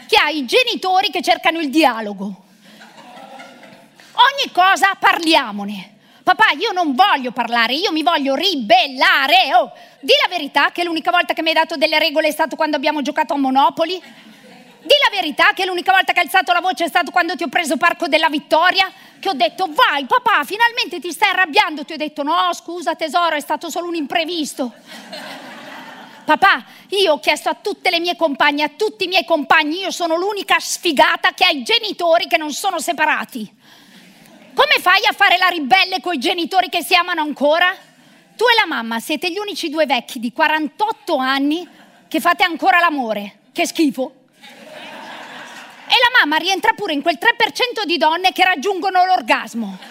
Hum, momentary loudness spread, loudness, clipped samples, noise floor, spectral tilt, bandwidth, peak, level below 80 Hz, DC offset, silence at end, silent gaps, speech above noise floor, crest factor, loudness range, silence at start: none; 13 LU; -16 LUFS; under 0.1%; -49 dBFS; -2 dB/octave; 16 kHz; 0 dBFS; -62 dBFS; under 0.1%; 0 s; none; 32 dB; 16 dB; 5 LU; 0 s